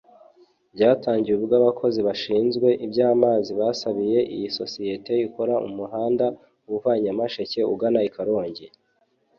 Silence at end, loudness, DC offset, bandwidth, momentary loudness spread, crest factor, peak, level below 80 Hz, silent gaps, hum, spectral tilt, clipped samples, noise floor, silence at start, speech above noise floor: 0.7 s; -23 LUFS; under 0.1%; 7 kHz; 9 LU; 18 dB; -4 dBFS; -64 dBFS; none; none; -6.5 dB/octave; under 0.1%; -67 dBFS; 0.75 s; 45 dB